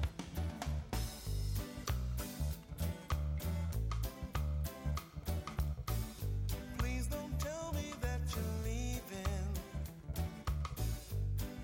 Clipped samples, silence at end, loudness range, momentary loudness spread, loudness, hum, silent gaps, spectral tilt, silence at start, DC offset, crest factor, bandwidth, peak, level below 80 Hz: under 0.1%; 0 s; 1 LU; 3 LU; -41 LUFS; none; none; -5.5 dB/octave; 0 s; under 0.1%; 12 dB; 17 kHz; -26 dBFS; -42 dBFS